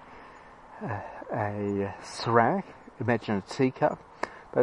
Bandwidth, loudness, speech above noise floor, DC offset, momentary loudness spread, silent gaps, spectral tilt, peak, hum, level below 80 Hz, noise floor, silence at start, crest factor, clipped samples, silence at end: 11 kHz; -29 LUFS; 21 dB; under 0.1%; 24 LU; none; -6.5 dB/octave; -6 dBFS; none; -64 dBFS; -50 dBFS; 0 s; 24 dB; under 0.1%; 0 s